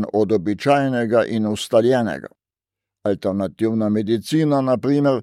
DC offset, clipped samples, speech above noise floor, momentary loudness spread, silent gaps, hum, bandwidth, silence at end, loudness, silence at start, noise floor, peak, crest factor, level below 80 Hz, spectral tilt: under 0.1%; under 0.1%; 70 dB; 6 LU; none; none; 14 kHz; 0 s; -19 LUFS; 0 s; -88 dBFS; -4 dBFS; 16 dB; -60 dBFS; -6.5 dB/octave